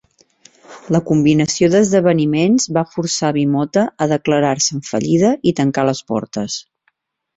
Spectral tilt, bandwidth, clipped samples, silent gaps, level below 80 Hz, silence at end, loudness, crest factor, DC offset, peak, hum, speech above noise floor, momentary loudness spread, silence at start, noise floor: -5 dB/octave; 8.2 kHz; under 0.1%; none; -54 dBFS; 0.75 s; -16 LUFS; 14 dB; under 0.1%; -2 dBFS; none; 50 dB; 8 LU; 0.7 s; -65 dBFS